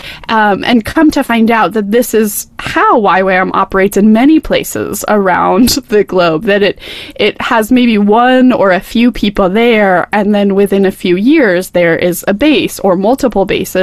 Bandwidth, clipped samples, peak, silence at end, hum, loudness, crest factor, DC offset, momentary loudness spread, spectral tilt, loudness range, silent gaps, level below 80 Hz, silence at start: 15 kHz; under 0.1%; 0 dBFS; 0 s; none; -10 LUFS; 10 dB; 0.4%; 5 LU; -5 dB/octave; 1 LU; none; -36 dBFS; 0.05 s